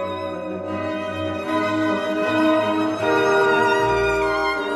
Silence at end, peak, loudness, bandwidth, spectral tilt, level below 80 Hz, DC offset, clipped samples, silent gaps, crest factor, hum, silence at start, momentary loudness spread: 0 s; -6 dBFS; -20 LUFS; 13 kHz; -5.5 dB/octave; -46 dBFS; under 0.1%; under 0.1%; none; 14 dB; none; 0 s; 10 LU